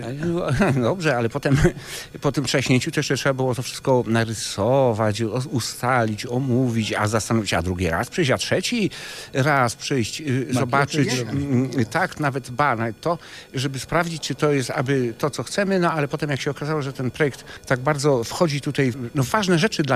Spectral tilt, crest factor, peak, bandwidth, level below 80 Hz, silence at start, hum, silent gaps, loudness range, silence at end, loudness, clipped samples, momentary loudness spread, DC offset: -5 dB/octave; 16 dB; -6 dBFS; 15.5 kHz; -44 dBFS; 0 s; none; none; 2 LU; 0 s; -22 LUFS; under 0.1%; 6 LU; under 0.1%